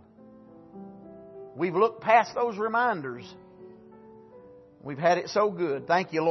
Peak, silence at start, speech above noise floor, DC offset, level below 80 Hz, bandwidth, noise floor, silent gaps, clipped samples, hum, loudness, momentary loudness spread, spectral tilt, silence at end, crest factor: -8 dBFS; 0.55 s; 26 dB; under 0.1%; -72 dBFS; 6.2 kHz; -52 dBFS; none; under 0.1%; none; -26 LUFS; 24 LU; -5.5 dB/octave; 0 s; 20 dB